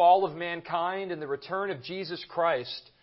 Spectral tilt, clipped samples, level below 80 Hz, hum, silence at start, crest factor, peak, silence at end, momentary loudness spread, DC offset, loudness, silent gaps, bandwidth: -8.5 dB/octave; under 0.1%; -74 dBFS; none; 0 s; 18 dB; -10 dBFS; 0.2 s; 10 LU; under 0.1%; -30 LUFS; none; 5.8 kHz